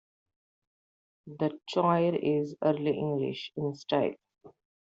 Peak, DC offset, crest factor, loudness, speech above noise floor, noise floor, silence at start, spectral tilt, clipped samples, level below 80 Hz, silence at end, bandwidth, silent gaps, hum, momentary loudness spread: -12 dBFS; under 0.1%; 18 dB; -30 LUFS; over 61 dB; under -90 dBFS; 1.25 s; -6 dB/octave; under 0.1%; -74 dBFS; 0.4 s; 7.8 kHz; none; none; 9 LU